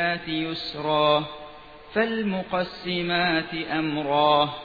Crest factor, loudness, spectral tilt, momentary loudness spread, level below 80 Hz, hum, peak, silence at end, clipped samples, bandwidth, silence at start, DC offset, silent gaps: 18 dB; -24 LUFS; -7 dB/octave; 9 LU; -56 dBFS; none; -8 dBFS; 0 s; under 0.1%; 4.9 kHz; 0 s; under 0.1%; none